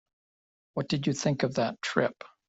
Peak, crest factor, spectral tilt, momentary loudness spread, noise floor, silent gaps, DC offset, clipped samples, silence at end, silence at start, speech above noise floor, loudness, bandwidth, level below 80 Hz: -8 dBFS; 22 dB; -5.5 dB/octave; 6 LU; under -90 dBFS; none; under 0.1%; under 0.1%; 0.2 s; 0.75 s; over 61 dB; -30 LUFS; 8 kHz; -66 dBFS